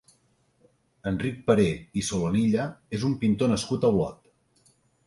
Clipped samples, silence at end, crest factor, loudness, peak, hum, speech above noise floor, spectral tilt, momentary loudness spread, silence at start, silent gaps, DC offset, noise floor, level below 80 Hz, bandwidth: under 0.1%; 0.95 s; 20 dB; -26 LUFS; -8 dBFS; none; 42 dB; -6 dB/octave; 8 LU; 1.05 s; none; under 0.1%; -66 dBFS; -52 dBFS; 11.5 kHz